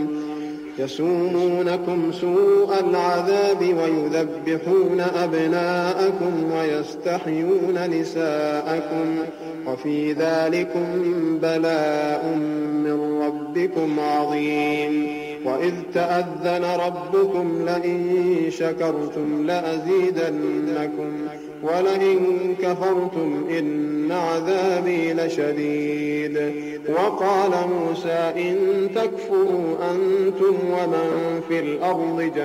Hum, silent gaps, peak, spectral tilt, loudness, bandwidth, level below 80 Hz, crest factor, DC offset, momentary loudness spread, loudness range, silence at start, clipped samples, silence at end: none; none; -8 dBFS; -6.5 dB/octave; -22 LUFS; 15 kHz; -66 dBFS; 12 dB; under 0.1%; 6 LU; 3 LU; 0 s; under 0.1%; 0 s